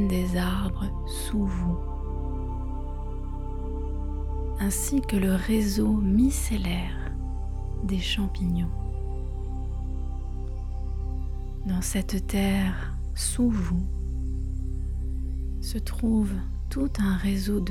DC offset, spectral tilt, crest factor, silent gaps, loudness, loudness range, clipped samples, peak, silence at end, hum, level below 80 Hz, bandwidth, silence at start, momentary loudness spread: under 0.1%; -5.5 dB/octave; 16 dB; none; -29 LUFS; 6 LU; under 0.1%; -12 dBFS; 0 s; none; -30 dBFS; 16.5 kHz; 0 s; 10 LU